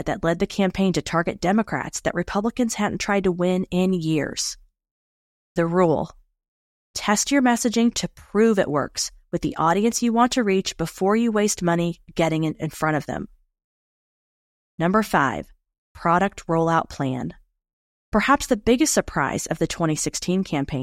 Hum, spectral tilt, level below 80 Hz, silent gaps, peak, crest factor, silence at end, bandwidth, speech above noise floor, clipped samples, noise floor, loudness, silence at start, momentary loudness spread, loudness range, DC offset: none; -4.5 dB/octave; -46 dBFS; 4.91-5.55 s, 6.48-6.94 s, 13.64-14.78 s, 15.78-15.95 s, 17.73-18.12 s; -4 dBFS; 20 dB; 0 s; 16 kHz; over 68 dB; under 0.1%; under -90 dBFS; -22 LUFS; 0 s; 8 LU; 4 LU; under 0.1%